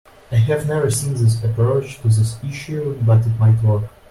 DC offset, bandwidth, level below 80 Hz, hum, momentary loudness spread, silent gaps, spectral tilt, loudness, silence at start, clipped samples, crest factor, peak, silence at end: under 0.1%; 12.5 kHz; -44 dBFS; none; 8 LU; none; -6.5 dB/octave; -18 LUFS; 0.3 s; under 0.1%; 10 dB; -6 dBFS; 0.2 s